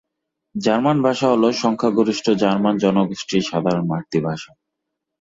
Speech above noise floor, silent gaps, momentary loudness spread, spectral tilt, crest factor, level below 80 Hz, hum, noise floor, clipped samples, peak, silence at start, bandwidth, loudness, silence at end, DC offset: 61 dB; none; 6 LU; -6 dB/octave; 16 dB; -60 dBFS; none; -80 dBFS; under 0.1%; -4 dBFS; 0.55 s; 7.8 kHz; -19 LUFS; 0.75 s; under 0.1%